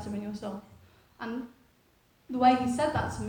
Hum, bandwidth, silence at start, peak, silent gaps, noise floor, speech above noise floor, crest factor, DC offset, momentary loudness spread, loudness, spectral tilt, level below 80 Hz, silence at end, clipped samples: none; 17.5 kHz; 0 s; -10 dBFS; none; -65 dBFS; 37 dB; 22 dB; under 0.1%; 18 LU; -29 LUFS; -6 dB/octave; -56 dBFS; 0 s; under 0.1%